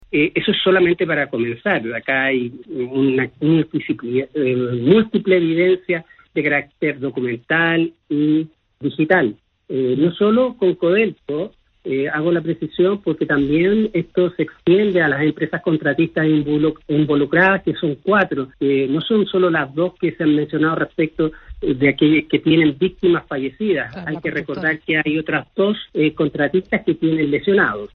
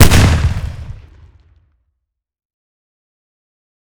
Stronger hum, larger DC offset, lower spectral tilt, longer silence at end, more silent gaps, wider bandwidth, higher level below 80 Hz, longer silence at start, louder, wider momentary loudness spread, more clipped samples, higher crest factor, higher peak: neither; neither; first, -9.5 dB/octave vs -4.5 dB/octave; second, 0.1 s vs 3 s; neither; second, 4.4 kHz vs over 20 kHz; second, -50 dBFS vs -22 dBFS; about the same, 0.1 s vs 0 s; second, -18 LUFS vs -14 LUFS; second, 8 LU vs 24 LU; second, under 0.1% vs 0.9%; about the same, 18 dB vs 16 dB; about the same, 0 dBFS vs 0 dBFS